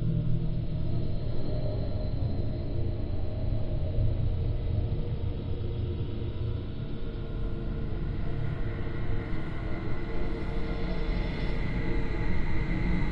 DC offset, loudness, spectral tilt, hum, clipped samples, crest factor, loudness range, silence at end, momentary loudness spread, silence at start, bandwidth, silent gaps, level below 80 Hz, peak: under 0.1%; -33 LUFS; -9.5 dB/octave; none; under 0.1%; 14 dB; 3 LU; 0 s; 5 LU; 0 s; 5.6 kHz; none; -32 dBFS; -14 dBFS